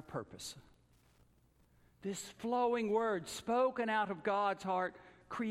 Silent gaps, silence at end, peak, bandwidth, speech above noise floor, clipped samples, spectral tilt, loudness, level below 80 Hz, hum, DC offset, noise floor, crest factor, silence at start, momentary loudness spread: none; 0 s; -22 dBFS; 15.5 kHz; 34 dB; under 0.1%; -4.5 dB/octave; -36 LUFS; -72 dBFS; none; under 0.1%; -70 dBFS; 16 dB; 0 s; 14 LU